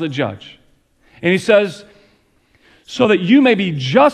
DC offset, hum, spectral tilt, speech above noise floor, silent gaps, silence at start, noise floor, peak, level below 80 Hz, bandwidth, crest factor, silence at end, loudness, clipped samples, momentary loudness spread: under 0.1%; none; -6 dB/octave; 42 dB; none; 0 s; -56 dBFS; 0 dBFS; -58 dBFS; 11 kHz; 16 dB; 0 s; -15 LUFS; under 0.1%; 16 LU